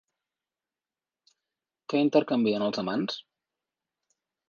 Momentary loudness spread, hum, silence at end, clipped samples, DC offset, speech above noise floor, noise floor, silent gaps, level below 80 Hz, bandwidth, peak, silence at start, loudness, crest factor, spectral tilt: 12 LU; none; 1.3 s; under 0.1%; under 0.1%; over 64 dB; under -90 dBFS; none; -76 dBFS; 7 kHz; -8 dBFS; 1.9 s; -27 LUFS; 22 dB; -6.5 dB/octave